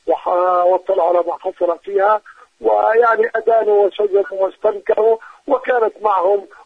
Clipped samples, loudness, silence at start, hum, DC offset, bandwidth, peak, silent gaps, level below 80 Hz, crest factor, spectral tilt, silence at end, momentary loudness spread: under 0.1%; -16 LUFS; 0.05 s; none; under 0.1%; 5.2 kHz; -2 dBFS; none; -62 dBFS; 14 dB; -5.5 dB/octave; 0.2 s; 7 LU